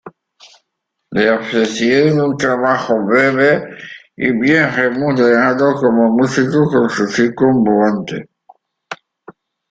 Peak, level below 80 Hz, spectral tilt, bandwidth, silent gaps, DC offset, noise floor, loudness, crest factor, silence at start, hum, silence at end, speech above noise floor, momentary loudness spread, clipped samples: -2 dBFS; -56 dBFS; -6 dB/octave; 9 kHz; none; under 0.1%; -74 dBFS; -14 LUFS; 14 dB; 0.05 s; none; 0.75 s; 61 dB; 15 LU; under 0.1%